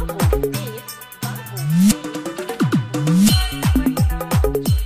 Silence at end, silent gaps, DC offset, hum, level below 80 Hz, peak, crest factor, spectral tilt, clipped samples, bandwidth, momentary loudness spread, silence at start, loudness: 0 s; none; under 0.1%; none; -26 dBFS; -2 dBFS; 16 dB; -5.5 dB/octave; under 0.1%; 16 kHz; 13 LU; 0 s; -19 LUFS